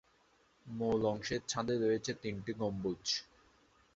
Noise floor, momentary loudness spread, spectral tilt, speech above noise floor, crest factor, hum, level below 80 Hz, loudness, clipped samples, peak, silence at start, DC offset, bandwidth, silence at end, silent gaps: -70 dBFS; 7 LU; -4.5 dB/octave; 34 dB; 18 dB; none; -64 dBFS; -36 LUFS; under 0.1%; -20 dBFS; 0.65 s; under 0.1%; 8 kHz; 0.7 s; none